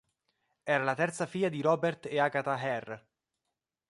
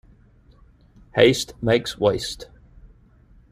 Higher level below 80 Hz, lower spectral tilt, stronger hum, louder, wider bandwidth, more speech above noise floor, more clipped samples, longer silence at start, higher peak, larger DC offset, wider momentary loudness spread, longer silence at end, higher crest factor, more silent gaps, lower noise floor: second, -78 dBFS vs -48 dBFS; about the same, -5.5 dB/octave vs -4.5 dB/octave; neither; second, -31 LUFS vs -21 LUFS; second, 11.5 kHz vs 15.5 kHz; first, 57 dB vs 33 dB; neither; second, 0.65 s vs 1.15 s; second, -12 dBFS vs -2 dBFS; neither; second, 11 LU vs 16 LU; first, 0.95 s vs 0.65 s; about the same, 20 dB vs 22 dB; neither; first, -87 dBFS vs -53 dBFS